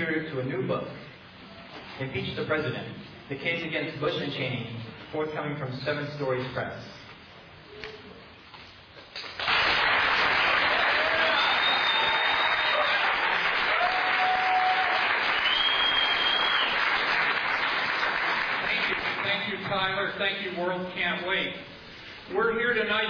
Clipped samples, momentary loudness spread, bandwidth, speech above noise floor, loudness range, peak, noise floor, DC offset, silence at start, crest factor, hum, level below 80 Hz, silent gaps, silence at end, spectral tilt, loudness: under 0.1%; 19 LU; 5.4 kHz; 19 dB; 11 LU; -12 dBFS; -49 dBFS; under 0.1%; 0 s; 16 dB; none; -58 dBFS; none; 0 s; -4.5 dB/octave; -25 LUFS